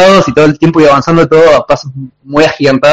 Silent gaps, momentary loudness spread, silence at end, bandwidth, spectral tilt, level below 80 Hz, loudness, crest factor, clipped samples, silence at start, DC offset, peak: none; 9 LU; 0 s; 9.4 kHz; -6 dB/octave; -36 dBFS; -7 LUFS; 6 dB; 3%; 0 s; under 0.1%; 0 dBFS